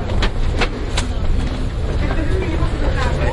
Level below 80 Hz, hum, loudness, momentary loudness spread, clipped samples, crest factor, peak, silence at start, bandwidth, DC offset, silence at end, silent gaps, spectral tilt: -20 dBFS; none; -21 LUFS; 3 LU; under 0.1%; 14 dB; -2 dBFS; 0 s; 11.5 kHz; under 0.1%; 0 s; none; -6 dB/octave